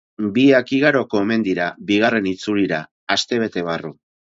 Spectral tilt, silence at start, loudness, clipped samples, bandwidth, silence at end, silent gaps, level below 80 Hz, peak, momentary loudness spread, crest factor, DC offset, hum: -5 dB/octave; 0.2 s; -19 LUFS; under 0.1%; 7.8 kHz; 0.4 s; 2.91-3.07 s; -58 dBFS; -2 dBFS; 10 LU; 18 dB; under 0.1%; none